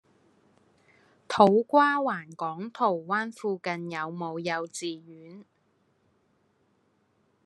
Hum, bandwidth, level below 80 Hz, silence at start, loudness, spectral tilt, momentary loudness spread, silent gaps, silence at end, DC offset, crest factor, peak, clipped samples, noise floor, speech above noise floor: none; 12 kHz; -76 dBFS; 1.3 s; -27 LUFS; -5 dB/octave; 15 LU; none; 2.05 s; under 0.1%; 24 dB; -4 dBFS; under 0.1%; -70 dBFS; 43 dB